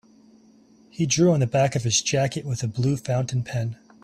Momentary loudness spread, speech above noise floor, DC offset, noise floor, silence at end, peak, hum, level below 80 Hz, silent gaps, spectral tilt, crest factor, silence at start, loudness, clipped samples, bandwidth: 10 LU; 32 dB; under 0.1%; -54 dBFS; 0.3 s; -8 dBFS; none; -56 dBFS; none; -5 dB/octave; 16 dB; 1 s; -23 LUFS; under 0.1%; 13 kHz